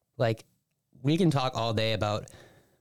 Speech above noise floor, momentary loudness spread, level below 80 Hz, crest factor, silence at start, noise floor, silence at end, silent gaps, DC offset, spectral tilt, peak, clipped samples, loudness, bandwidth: 35 dB; 11 LU; -58 dBFS; 14 dB; 0.2 s; -62 dBFS; 0.3 s; none; under 0.1%; -6.5 dB/octave; -16 dBFS; under 0.1%; -29 LUFS; 13.5 kHz